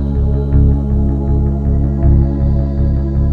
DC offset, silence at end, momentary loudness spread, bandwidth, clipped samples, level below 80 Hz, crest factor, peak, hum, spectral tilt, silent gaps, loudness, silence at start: under 0.1%; 0 s; 3 LU; 2 kHz; under 0.1%; -14 dBFS; 12 dB; 0 dBFS; none; -12 dB/octave; none; -15 LUFS; 0 s